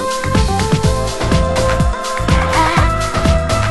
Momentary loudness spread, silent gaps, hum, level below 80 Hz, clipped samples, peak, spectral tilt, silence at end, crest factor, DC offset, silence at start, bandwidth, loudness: 4 LU; none; none; -20 dBFS; under 0.1%; 0 dBFS; -5 dB/octave; 0 s; 14 dB; under 0.1%; 0 s; 12 kHz; -15 LUFS